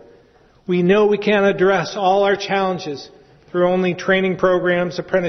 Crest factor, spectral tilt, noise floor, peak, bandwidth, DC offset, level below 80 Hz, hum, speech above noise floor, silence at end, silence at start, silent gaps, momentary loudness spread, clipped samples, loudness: 14 dB; -6 dB/octave; -52 dBFS; -4 dBFS; 6.4 kHz; under 0.1%; -52 dBFS; none; 35 dB; 0 s; 0.7 s; none; 10 LU; under 0.1%; -17 LUFS